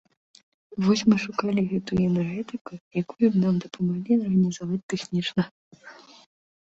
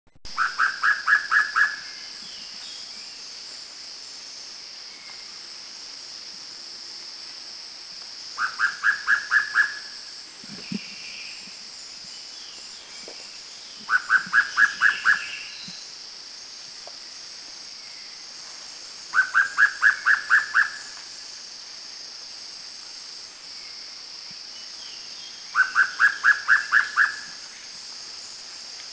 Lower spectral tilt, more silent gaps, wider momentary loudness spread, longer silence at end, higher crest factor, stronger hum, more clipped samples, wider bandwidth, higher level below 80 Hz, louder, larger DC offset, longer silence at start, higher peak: first, -6.5 dB/octave vs 0.5 dB/octave; first, 2.61-2.65 s, 2.80-2.91 s, 4.83-4.89 s, 5.51-5.71 s vs none; second, 11 LU vs 18 LU; first, 0.8 s vs 0 s; about the same, 18 dB vs 22 dB; neither; neither; about the same, 8 kHz vs 8 kHz; first, -58 dBFS vs -68 dBFS; second, -25 LUFS vs -22 LUFS; neither; first, 0.7 s vs 0.15 s; about the same, -8 dBFS vs -6 dBFS